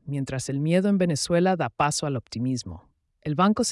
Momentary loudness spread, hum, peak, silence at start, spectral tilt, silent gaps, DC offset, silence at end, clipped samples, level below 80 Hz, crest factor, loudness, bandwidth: 9 LU; none; -10 dBFS; 0.05 s; -5.5 dB/octave; none; under 0.1%; 0 s; under 0.1%; -56 dBFS; 14 dB; -25 LUFS; 12 kHz